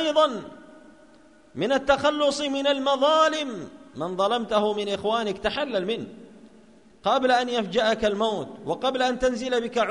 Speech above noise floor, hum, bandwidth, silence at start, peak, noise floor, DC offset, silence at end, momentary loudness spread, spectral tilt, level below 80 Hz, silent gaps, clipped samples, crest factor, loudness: 30 dB; none; 10.5 kHz; 0 s; -8 dBFS; -54 dBFS; 0.1%; 0 s; 11 LU; -4 dB/octave; -54 dBFS; none; under 0.1%; 18 dB; -24 LUFS